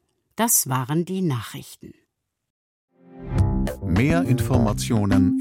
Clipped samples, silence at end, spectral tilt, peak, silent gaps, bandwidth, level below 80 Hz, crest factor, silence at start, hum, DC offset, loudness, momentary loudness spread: under 0.1%; 0 s; -5.5 dB/octave; -6 dBFS; 2.50-2.88 s; 17 kHz; -36 dBFS; 16 dB; 0.4 s; none; under 0.1%; -22 LUFS; 17 LU